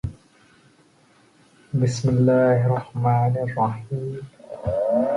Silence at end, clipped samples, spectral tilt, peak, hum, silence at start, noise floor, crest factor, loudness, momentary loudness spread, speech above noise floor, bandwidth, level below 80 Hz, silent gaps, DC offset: 0 s; under 0.1%; -8 dB/octave; -8 dBFS; none; 0.05 s; -57 dBFS; 14 dB; -22 LUFS; 15 LU; 36 dB; 10.5 kHz; -48 dBFS; none; under 0.1%